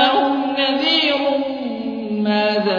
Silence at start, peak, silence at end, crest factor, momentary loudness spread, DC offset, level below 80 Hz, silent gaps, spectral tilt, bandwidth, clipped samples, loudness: 0 s; -2 dBFS; 0 s; 16 dB; 9 LU; under 0.1%; -62 dBFS; none; -5.5 dB/octave; 5.2 kHz; under 0.1%; -18 LUFS